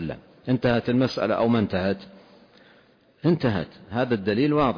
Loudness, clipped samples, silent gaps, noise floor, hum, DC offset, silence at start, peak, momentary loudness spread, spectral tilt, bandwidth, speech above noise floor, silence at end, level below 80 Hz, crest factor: -24 LUFS; under 0.1%; none; -57 dBFS; none; under 0.1%; 0 s; -10 dBFS; 9 LU; -8 dB/octave; 5.2 kHz; 34 dB; 0 s; -52 dBFS; 14 dB